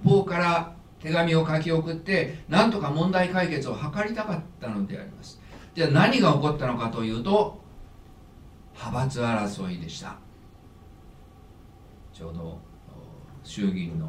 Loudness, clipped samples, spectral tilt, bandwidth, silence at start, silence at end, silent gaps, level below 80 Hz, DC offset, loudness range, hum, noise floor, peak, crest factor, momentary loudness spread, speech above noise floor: -25 LUFS; under 0.1%; -6.5 dB/octave; 11.5 kHz; 0 s; 0 s; none; -50 dBFS; under 0.1%; 15 LU; none; -49 dBFS; -6 dBFS; 20 dB; 22 LU; 24 dB